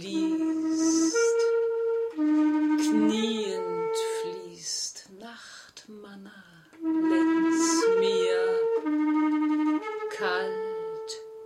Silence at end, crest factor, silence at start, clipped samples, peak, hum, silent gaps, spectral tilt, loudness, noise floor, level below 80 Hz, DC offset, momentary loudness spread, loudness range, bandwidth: 0 s; 14 dB; 0 s; under 0.1%; -12 dBFS; none; none; -3.5 dB/octave; -26 LUFS; -52 dBFS; -74 dBFS; under 0.1%; 20 LU; 8 LU; 12.5 kHz